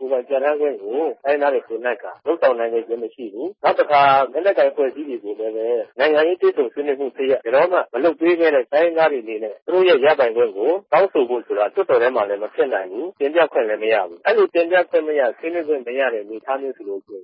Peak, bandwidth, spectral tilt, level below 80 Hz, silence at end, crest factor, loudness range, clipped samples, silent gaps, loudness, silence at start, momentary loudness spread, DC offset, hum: -4 dBFS; 5.6 kHz; -9 dB/octave; -80 dBFS; 0 s; 14 dB; 3 LU; under 0.1%; 9.62-9.66 s; -19 LUFS; 0 s; 10 LU; under 0.1%; none